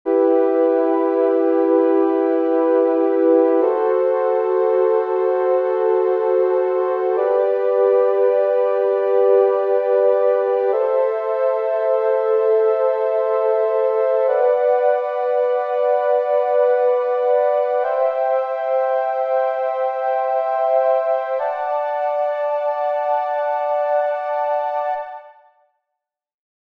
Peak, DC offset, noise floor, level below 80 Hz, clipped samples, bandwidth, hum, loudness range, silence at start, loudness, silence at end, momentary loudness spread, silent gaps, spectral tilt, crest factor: -4 dBFS; under 0.1%; -81 dBFS; -78 dBFS; under 0.1%; 4.7 kHz; none; 4 LU; 0.05 s; -18 LUFS; 1.35 s; 5 LU; none; -5.5 dB/octave; 14 dB